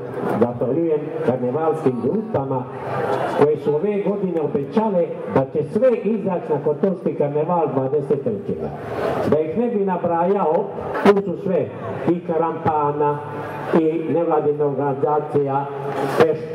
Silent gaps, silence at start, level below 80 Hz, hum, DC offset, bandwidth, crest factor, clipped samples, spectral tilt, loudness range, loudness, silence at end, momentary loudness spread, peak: none; 0 s; -58 dBFS; none; under 0.1%; 12 kHz; 18 dB; under 0.1%; -8.5 dB/octave; 1 LU; -21 LUFS; 0 s; 7 LU; -2 dBFS